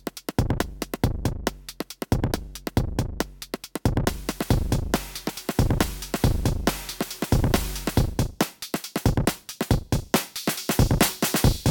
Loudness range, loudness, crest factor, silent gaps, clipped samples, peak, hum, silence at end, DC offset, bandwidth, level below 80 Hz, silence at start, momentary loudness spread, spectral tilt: 4 LU; -26 LUFS; 18 dB; none; under 0.1%; -6 dBFS; none; 0 s; under 0.1%; 19 kHz; -32 dBFS; 0.05 s; 10 LU; -5 dB/octave